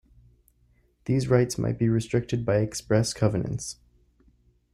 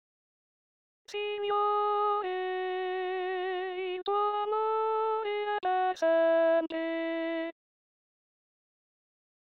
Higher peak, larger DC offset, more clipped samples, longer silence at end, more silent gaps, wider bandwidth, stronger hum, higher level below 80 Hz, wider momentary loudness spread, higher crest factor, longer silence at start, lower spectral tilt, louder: first, -8 dBFS vs -18 dBFS; neither; neither; second, 1 s vs 2 s; neither; first, 13.5 kHz vs 7.4 kHz; first, 60 Hz at -45 dBFS vs none; first, -52 dBFS vs -82 dBFS; first, 11 LU vs 8 LU; first, 20 dB vs 14 dB; about the same, 1.05 s vs 1.1 s; first, -6 dB/octave vs 1 dB/octave; first, -26 LUFS vs -30 LUFS